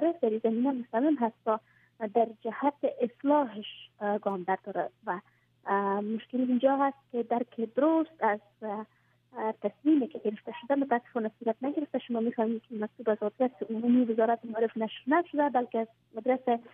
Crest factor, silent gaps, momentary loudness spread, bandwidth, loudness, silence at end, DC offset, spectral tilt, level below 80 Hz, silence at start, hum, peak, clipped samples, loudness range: 18 dB; none; 10 LU; 3.8 kHz; -30 LUFS; 0.05 s; under 0.1%; -9.5 dB/octave; -84 dBFS; 0 s; none; -12 dBFS; under 0.1%; 3 LU